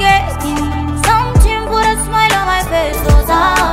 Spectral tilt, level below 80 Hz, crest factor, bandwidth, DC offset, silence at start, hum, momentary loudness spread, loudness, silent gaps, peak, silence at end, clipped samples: -4.5 dB/octave; -18 dBFS; 12 dB; 16 kHz; under 0.1%; 0 s; none; 6 LU; -13 LUFS; none; 0 dBFS; 0 s; under 0.1%